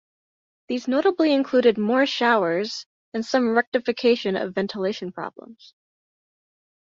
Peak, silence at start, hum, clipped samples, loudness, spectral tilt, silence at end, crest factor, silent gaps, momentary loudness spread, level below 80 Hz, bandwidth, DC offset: -6 dBFS; 0.7 s; none; under 0.1%; -22 LUFS; -5 dB/octave; 1.35 s; 18 dB; 2.86-3.12 s, 3.67-3.72 s; 12 LU; -70 dBFS; 7.6 kHz; under 0.1%